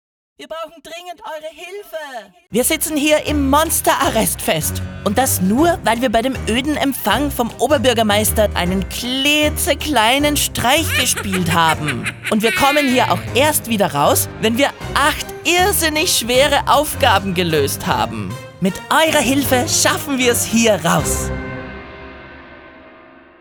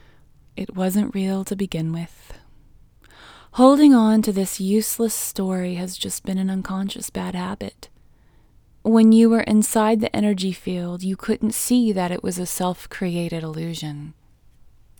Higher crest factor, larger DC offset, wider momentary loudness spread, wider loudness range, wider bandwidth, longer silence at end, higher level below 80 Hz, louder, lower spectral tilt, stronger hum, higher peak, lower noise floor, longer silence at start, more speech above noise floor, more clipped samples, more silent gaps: about the same, 16 dB vs 20 dB; neither; about the same, 16 LU vs 16 LU; second, 3 LU vs 8 LU; about the same, over 20 kHz vs over 20 kHz; second, 0.5 s vs 0.9 s; first, -36 dBFS vs -50 dBFS; first, -15 LUFS vs -20 LUFS; second, -3.5 dB/octave vs -5.5 dB/octave; neither; about the same, 0 dBFS vs 0 dBFS; second, -43 dBFS vs -53 dBFS; second, 0.4 s vs 0.55 s; second, 27 dB vs 33 dB; neither; neither